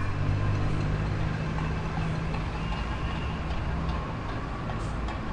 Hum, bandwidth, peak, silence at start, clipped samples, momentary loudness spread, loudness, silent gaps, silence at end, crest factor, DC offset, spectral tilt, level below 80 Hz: none; 10 kHz; -14 dBFS; 0 s; under 0.1%; 5 LU; -31 LUFS; none; 0 s; 14 dB; under 0.1%; -7 dB/octave; -34 dBFS